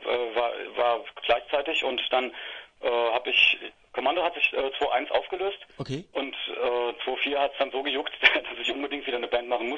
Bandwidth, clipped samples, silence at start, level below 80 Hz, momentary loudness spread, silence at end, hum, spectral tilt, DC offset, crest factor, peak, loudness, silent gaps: 7.6 kHz; under 0.1%; 0 s; -60 dBFS; 12 LU; 0 s; none; -4 dB/octave; under 0.1%; 24 dB; -4 dBFS; -26 LUFS; none